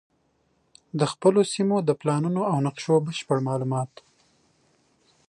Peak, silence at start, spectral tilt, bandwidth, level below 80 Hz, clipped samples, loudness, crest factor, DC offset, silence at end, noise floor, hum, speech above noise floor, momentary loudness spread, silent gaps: -8 dBFS; 0.95 s; -6.5 dB/octave; 11.5 kHz; -70 dBFS; under 0.1%; -24 LUFS; 18 dB; under 0.1%; 1.4 s; -68 dBFS; none; 45 dB; 8 LU; none